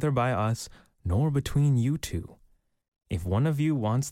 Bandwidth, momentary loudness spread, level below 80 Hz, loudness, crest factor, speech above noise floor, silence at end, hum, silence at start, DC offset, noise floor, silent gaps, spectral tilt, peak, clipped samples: 15.5 kHz; 12 LU; -46 dBFS; -27 LUFS; 14 dB; 38 dB; 0 s; none; 0 s; under 0.1%; -64 dBFS; 2.88-2.92 s; -7 dB/octave; -14 dBFS; under 0.1%